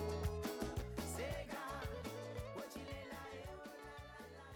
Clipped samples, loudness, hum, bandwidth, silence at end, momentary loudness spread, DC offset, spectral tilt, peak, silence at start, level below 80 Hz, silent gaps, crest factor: under 0.1%; -47 LUFS; none; over 20 kHz; 0 s; 10 LU; under 0.1%; -5 dB/octave; -30 dBFS; 0 s; -54 dBFS; none; 16 dB